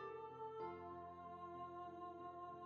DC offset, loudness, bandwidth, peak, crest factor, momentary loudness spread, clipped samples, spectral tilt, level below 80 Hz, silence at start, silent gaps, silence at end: under 0.1%; -53 LUFS; 6.8 kHz; -38 dBFS; 14 dB; 4 LU; under 0.1%; -5.5 dB/octave; -82 dBFS; 0 s; none; 0 s